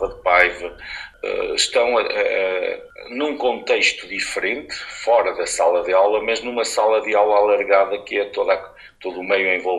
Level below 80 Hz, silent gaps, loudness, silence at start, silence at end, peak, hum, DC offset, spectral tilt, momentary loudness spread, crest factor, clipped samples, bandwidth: -52 dBFS; none; -19 LUFS; 0 s; 0 s; 0 dBFS; none; under 0.1%; -1.5 dB/octave; 13 LU; 20 dB; under 0.1%; 13 kHz